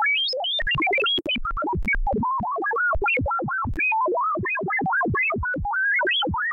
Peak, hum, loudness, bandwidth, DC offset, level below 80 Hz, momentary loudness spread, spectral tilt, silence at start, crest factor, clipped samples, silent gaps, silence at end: -14 dBFS; none; -22 LUFS; 7.2 kHz; under 0.1%; -36 dBFS; 5 LU; -6.5 dB/octave; 0 s; 8 dB; under 0.1%; none; 0 s